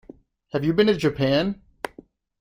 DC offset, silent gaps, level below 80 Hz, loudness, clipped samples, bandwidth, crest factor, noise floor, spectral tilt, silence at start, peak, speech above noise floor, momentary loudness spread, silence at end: under 0.1%; none; -52 dBFS; -22 LUFS; under 0.1%; 16 kHz; 20 dB; -50 dBFS; -6.5 dB/octave; 0.55 s; -4 dBFS; 30 dB; 17 LU; 0.55 s